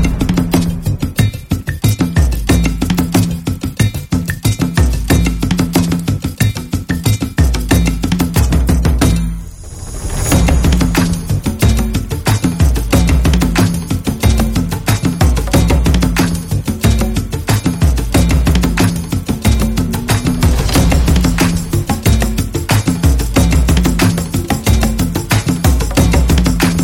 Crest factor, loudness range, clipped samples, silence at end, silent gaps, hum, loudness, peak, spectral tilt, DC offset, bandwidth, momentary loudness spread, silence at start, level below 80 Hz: 12 dB; 2 LU; under 0.1%; 0 s; none; none; -14 LUFS; 0 dBFS; -5.5 dB/octave; 0.1%; 17 kHz; 6 LU; 0 s; -18 dBFS